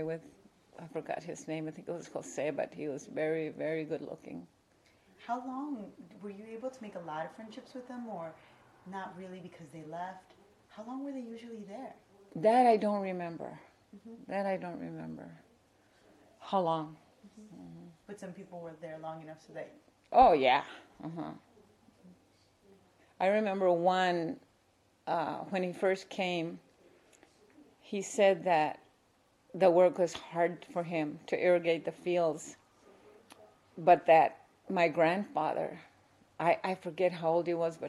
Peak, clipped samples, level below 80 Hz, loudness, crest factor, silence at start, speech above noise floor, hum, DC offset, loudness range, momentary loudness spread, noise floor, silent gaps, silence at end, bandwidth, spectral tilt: -12 dBFS; under 0.1%; -70 dBFS; -32 LUFS; 22 dB; 0 s; 37 dB; none; under 0.1%; 14 LU; 22 LU; -70 dBFS; none; 0 s; 12 kHz; -5.5 dB/octave